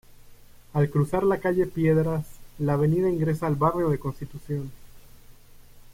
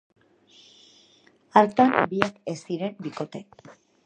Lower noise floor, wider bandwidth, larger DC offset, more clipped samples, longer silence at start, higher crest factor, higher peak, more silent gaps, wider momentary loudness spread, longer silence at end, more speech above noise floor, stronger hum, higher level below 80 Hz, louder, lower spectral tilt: second, -48 dBFS vs -59 dBFS; first, 16 kHz vs 9.4 kHz; neither; neither; second, 0.25 s vs 1.55 s; second, 16 dB vs 26 dB; second, -10 dBFS vs 0 dBFS; neither; second, 11 LU vs 16 LU; second, 0 s vs 0.65 s; second, 24 dB vs 35 dB; neither; first, -48 dBFS vs -68 dBFS; about the same, -25 LUFS vs -24 LUFS; first, -9 dB/octave vs -6 dB/octave